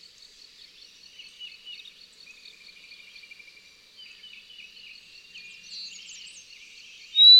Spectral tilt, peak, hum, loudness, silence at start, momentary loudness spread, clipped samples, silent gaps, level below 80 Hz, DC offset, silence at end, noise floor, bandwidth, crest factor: 3 dB/octave; -6 dBFS; none; -26 LUFS; 7.15 s; 10 LU; under 0.1%; none; -76 dBFS; under 0.1%; 0 s; -53 dBFS; 12.5 kHz; 20 dB